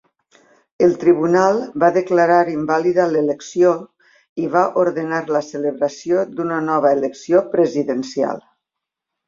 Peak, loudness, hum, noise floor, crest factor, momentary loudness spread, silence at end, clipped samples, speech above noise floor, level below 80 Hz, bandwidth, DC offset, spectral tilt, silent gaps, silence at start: -2 dBFS; -18 LUFS; none; -83 dBFS; 16 dB; 8 LU; 0.9 s; under 0.1%; 66 dB; -62 dBFS; 7.6 kHz; under 0.1%; -6.5 dB/octave; 4.29-4.36 s; 0.8 s